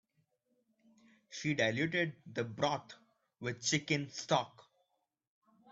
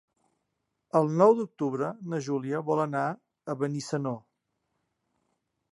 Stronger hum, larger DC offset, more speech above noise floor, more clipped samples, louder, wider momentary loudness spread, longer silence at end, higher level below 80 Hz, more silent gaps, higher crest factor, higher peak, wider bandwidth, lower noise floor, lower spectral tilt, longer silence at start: neither; neither; second, 48 dB vs 54 dB; neither; second, -35 LUFS vs -28 LUFS; about the same, 11 LU vs 13 LU; second, 1.1 s vs 1.55 s; first, -74 dBFS vs -80 dBFS; neither; about the same, 22 dB vs 22 dB; second, -16 dBFS vs -8 dBFS; second, 8.2 kHz vs 11.5 kHz; about the same, -83 dBFS vs -81 dBFS; second, -4 dB/octave vs -7 dB/octave; first, 1.3 s vs 0.95 s